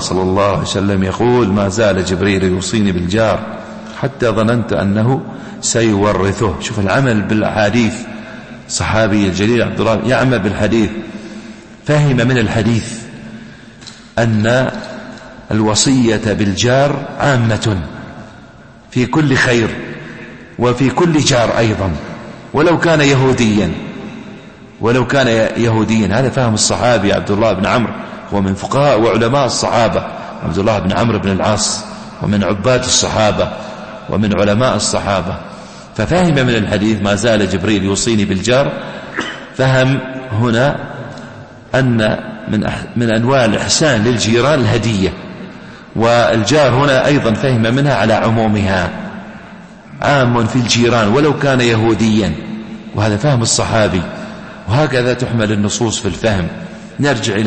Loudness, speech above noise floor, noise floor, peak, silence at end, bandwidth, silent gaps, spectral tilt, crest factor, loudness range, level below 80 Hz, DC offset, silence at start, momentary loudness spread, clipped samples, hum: -14 LUFS; 26 dB; -38 dBFS; 0 dBFS; 0 s; 8.8 kHz; none; -5 dB/octave; 14 dB; 3 LU; -38 dBFS; under 0.1%; 0 s; 17 LU; under 0.1%; none